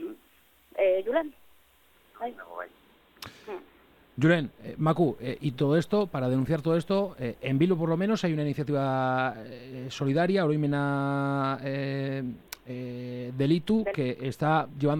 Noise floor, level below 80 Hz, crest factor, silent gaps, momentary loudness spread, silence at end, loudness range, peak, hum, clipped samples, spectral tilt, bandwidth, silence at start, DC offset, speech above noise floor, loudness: -62 dBFS; -60 dBFS; 18 dB; none; 16 LU; 0 s; 6 LU; -10 dBFS; none; under 0.1%; -7.5 dB/octave; 17 kHz; 0 s; under 0.1%; 34 dB; -28 LUFS